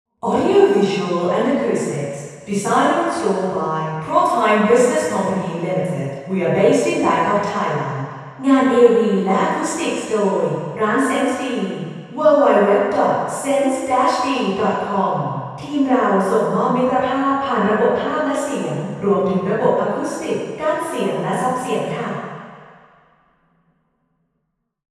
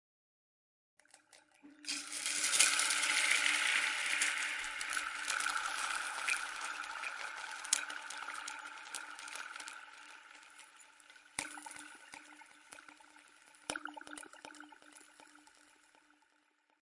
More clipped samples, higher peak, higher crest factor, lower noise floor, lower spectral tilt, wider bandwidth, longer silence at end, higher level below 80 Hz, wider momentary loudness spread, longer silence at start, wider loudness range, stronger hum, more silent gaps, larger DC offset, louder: neither; first, 0 dBFS vs -8 dBFS; second, 18 dB vs 32 dB; about the same, -73 dBFS vs -75 dBFS; first, -5.5 dB/octave vs 2.5 dB/octave; first, 13.5 kHz vs 11.5 kHz; first, 2.3 s vs 1.6 s; first, -60 dBFS vs -80 dBFS; second, 10 LU vs 25 LU; second, 0.25 s vs 1.35 s; second, 5 LU vs 19 LU; neither; neither; neither; first, -18 LUFS vs -35 LUFS